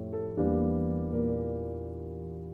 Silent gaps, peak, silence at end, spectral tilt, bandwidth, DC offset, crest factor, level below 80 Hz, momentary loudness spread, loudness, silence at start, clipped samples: none; -18 dBFS; 0 s; -12.5 dB/octave; 2.5 kHz; under 0.1%; 14 dB; -44 dBFS; 11 LU; -32 LUFS; 0 s; under 0.1%